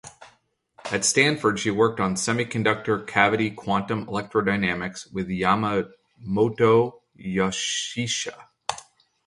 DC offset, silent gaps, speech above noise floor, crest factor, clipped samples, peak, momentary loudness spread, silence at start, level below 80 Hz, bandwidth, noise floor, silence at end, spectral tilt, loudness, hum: under 0.1%; none; 39 dB; 22 dB; under 0.1%; -2 dBFS; 14 LU; 0.05 s; -56 dBFS; 11.5 kHz; -62 dBFS; 0.45 s; -4 dB/octave; -23 LUFS; none